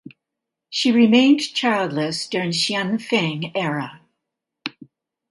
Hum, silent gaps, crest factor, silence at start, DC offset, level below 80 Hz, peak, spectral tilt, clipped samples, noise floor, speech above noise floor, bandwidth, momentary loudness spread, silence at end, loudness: none; none; 20 dB; 0.7 s; under 0.1%; -68 dBFS; -2 dBFS; -4.5 dB/octave; under 0.1%; -83 dBFS; 64 dB; 11.5 kHz; 19 LU; 0.6 s; -19 LUFS